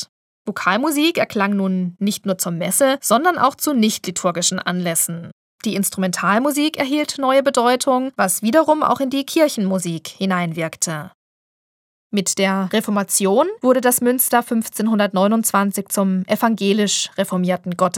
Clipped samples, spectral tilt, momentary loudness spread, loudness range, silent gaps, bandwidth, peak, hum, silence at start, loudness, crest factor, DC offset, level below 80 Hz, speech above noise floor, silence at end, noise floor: under 0.1%; -4 dB/octave; 6 LU; 4 LU; 0.09-0.45 s, 5.32-5.59 s, 11.14-12.10 s; 18 kHz; 0 dBFS; none; 0 s; -18 LUFS; 18 dB; under 0.1%; -68 dBFS; over 72 dB; 0 s; under -90 dBFS